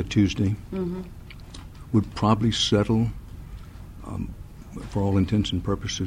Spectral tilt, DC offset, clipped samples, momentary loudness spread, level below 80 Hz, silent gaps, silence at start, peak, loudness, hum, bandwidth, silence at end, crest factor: -6 dB/octave; under 0.1%; under 0.1%; 21 LU; -40 dBFS; none; 0 s; -6 dBFS; -25 LUFS; none; 11.5 kHz; 0 s; 18 dB